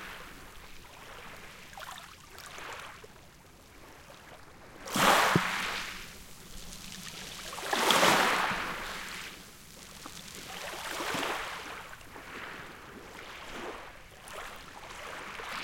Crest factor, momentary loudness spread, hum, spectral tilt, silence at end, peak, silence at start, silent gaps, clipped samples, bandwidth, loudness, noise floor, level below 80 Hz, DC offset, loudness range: 26 dB; 24 LU; none; -2.5 dB/octave; 0 s; -8 dBFS; 0 s; none; under 0.1%; 17 kHz; -31 LUFS; -55 dBFS; -56 dBFS; under 0.1%; 17 LU